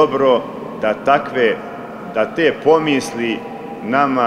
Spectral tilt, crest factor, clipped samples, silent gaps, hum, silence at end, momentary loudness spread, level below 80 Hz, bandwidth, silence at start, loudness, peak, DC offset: -5 dB/octave; 16 dB; under 0.1%; none; none; 0 s; 14 LU; -56 dBFS; 13.5 kHz; 0 s; -17 LUFS; -2 dBFS; under 0.1%